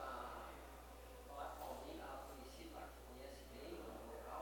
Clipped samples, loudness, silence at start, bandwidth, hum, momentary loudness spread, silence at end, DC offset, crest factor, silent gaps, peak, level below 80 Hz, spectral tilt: under 0.1%; -54 LUFS; 0 s; 17 kHz; none; 6 LU; 0 s; under 0.1%; 16 dB; none; -36 dBFS; -60 dBFS; -4.5 dB/octave